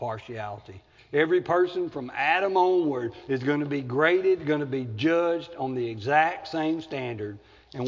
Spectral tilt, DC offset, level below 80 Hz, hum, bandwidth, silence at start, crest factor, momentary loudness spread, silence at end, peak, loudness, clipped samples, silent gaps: -7 dB/octave; under 0.1%; -62 dBFS; none; 7.4 kHz; 0 s; 18 dB; 13 LU; 0 s; -8 dBFS; -26 LUFS; under 0.1%; none